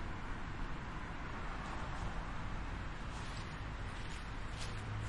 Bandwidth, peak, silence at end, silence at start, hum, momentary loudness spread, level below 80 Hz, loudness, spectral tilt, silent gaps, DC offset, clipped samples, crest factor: 11.5 kHz; -28 dBFS; 0 s; 0 s; none; 2 LU; -46 dBFS; -45 LUFS; -5 dB/octave; none; under 0.1%; under 0.1%; 14 dB